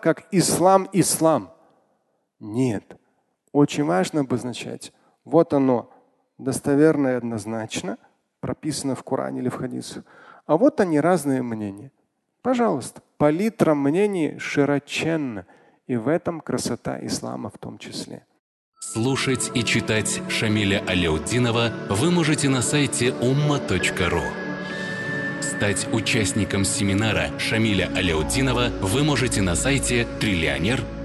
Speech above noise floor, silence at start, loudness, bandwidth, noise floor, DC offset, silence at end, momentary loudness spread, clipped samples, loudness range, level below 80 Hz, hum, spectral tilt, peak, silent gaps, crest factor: 48 dB; 0 s; -22 LUFS; 12.5 kHz; -70 dBFS; under 0.1%; 0 s; 13 LU; under 0.1%; 5 LU; -42 dBFS; none; -4.5 dB/octave; -2 dBFS; 18.39-18.72 s; 20 dB